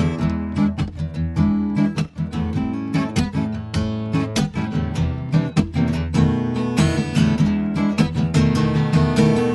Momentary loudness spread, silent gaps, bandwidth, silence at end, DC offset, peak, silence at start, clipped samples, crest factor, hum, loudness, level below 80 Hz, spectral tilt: 6 LU; none; 11.5 kHz; 0 s; under 0.1%; -2 dBFS; 0 s; under 0.1%; 16 dB; none; -20 LUFS; -36 dBFS; -7 dB/octave